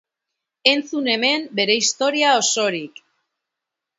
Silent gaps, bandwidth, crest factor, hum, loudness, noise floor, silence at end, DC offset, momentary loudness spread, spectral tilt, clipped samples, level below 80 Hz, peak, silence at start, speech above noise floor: none; 8 kHz; 22 dB; none; -18 LUFS; -84 dBFS; 1.1 s; under 0.1%; 6 LU; -1 dB/octave; under 0.1%; -76 dBFS; 0 dBFS; 0.65 s; 65 dB